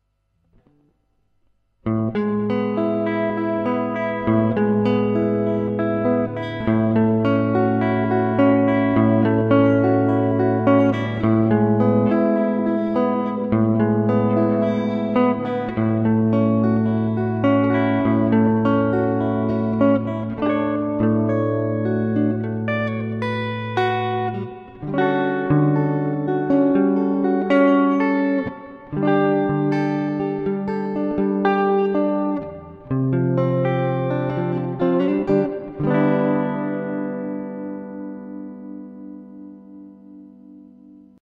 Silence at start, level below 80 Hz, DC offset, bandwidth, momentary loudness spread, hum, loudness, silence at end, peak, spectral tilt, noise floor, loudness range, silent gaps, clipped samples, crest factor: 1.85 s; -52 dBFS; under 0.1%; 5.2 kHz; 9 LU; none; -20 LUFS; 0.8 s; -4 dBFS; -10 dB/octave; -67 dBFS; 6 LU; none; under 0.1%; 16 dB